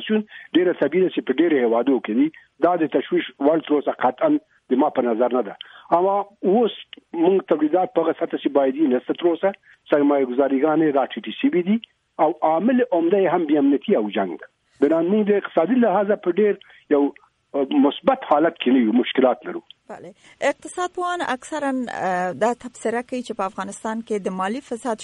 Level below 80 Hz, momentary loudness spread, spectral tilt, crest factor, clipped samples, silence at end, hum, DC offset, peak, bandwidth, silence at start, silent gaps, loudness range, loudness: -68 dBFS; 9 LU; -6 dB/octave; 16 dB; under 0.1%; 0 s; none; under 0.1%; -4 dBFS; 11 kHz; 0 s; none; 5 LU; -21 LUFS